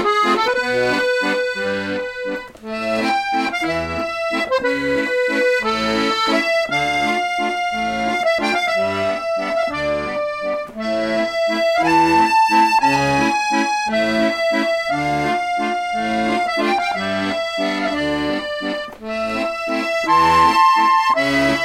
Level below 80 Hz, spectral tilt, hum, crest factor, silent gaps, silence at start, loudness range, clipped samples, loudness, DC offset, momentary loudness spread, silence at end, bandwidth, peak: -48 dBFS; -4 dB/octave; none; 14 dB; none; 0 s; 5 LU; under 0.1%; -18 LUFS; under 0.1%; 9 LU; 0 s; 16.5 kHz; -4 dBFS